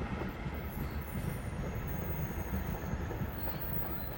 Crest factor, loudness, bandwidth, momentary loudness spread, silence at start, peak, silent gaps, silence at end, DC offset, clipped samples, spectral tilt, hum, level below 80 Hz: 14 dB; -38 LUFS; 17 kHz; 5 LU; 0 s; -24 dBFS; none; 0 s; under 0.1%; under 0.1%; -6.5 dB/octave; none; -44 dBFS